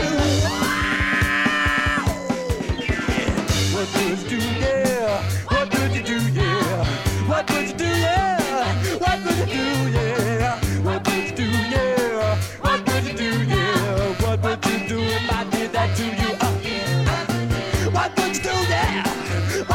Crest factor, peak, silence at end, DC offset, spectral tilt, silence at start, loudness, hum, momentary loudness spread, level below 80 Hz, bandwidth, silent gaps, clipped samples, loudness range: 16 dB; -6 dBFS; 0 s; under 0.1%; -5 dB/octave; 0 s; -21 LUFS; none; 4 LU; -34 dBFS; 17 kHz; none; under 0.1%; 1 LU